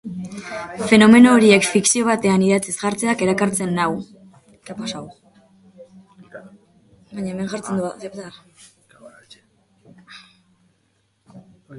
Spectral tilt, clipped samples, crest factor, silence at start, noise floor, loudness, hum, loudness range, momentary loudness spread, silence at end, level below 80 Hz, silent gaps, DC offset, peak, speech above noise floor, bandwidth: -4.5 dB/octave; under 0.1%; 20 dB; 0.05 s; -65 dBFS; -16 LUFS; none; 19 LU; 23 LU; 0 s; -58 dBFS; none; under 0.1%; 0 dBFS; 48 dB; 11.5 kHz